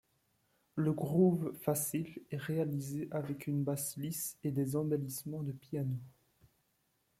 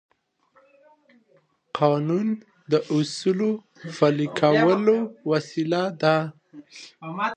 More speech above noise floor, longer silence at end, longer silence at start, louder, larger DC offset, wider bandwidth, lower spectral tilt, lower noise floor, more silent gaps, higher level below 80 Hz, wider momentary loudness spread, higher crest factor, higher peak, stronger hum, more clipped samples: about the same, 43 dB vs 40 dB; first, 1.1 s vs 0 s; second, 0.75 s vs 1.75 s; second, -36 LUFS vs -23 LUFS; neither; first, 16.5 kHz vs 9.4 kHz; about the same, -6.5 dB/octave vs -6.5 dB/octave; first, -78 dBFS vs -63 dBFS; neither; about the same, -72 dBFS vs -74 dBFS; second, 10 LU vs 17 LU; about the same, 18 dB vs 20 dB; second, -18 dBFS vs -4 dBFS; neither; neither